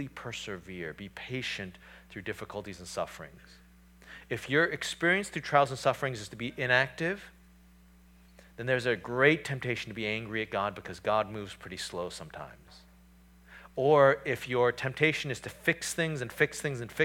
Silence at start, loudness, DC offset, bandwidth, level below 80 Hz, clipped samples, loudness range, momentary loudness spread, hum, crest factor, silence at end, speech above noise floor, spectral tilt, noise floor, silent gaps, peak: 0 s; -30 LUFS; under 0.1%; 18.5 kHz; -60 dBFS; under 0.1%; 10 LU; 16 LU; none; 22 dB; 0 s; 27 dB; -4.5 dB/octave; -58 dBFS; none; -10 dBFS